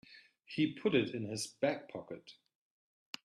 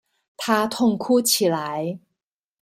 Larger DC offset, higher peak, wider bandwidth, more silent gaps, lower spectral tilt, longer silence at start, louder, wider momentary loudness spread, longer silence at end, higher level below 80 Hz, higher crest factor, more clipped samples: neither; second, -16 dBFS vs -4 dBFS; second, 12.5 kHz vs 16 kHz; neither; first, -5 dB/octave vs -3.5 dB/octave; second, 0.1 s vs 0.4 s; second, -36 LUFS vs -21 LUFS; first, 17 LU vs 13 LU; first, 0.95 s vs 0.65 s; second, -78 dBFS vs -66 dBFS; about the same, 22 dB vs 18 dB; neither